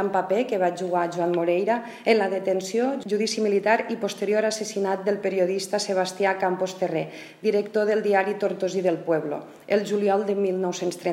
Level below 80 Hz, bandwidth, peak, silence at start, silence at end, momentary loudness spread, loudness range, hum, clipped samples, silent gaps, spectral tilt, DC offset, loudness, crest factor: -80 dBFS; 15.5 kHz; -6 dBFS; 0 s; 0 s; 5 LU; 1 LU; none; under 0.1%; none; -4.5 dB/octave; under 0.1%; -24 LUFS; 18 dB